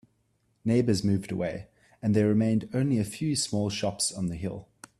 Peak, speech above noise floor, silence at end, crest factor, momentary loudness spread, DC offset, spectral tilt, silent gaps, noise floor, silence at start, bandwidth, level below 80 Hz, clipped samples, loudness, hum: -10 dBFS; 44 dB; 0.35 s; 18 dB; 11 LU; under 0.1%; -5.5 dB/octave; none; -71 dBFS; 0.65 s; 13 kHz; -58 dBFS; under 0.1%; -28 LUFS; none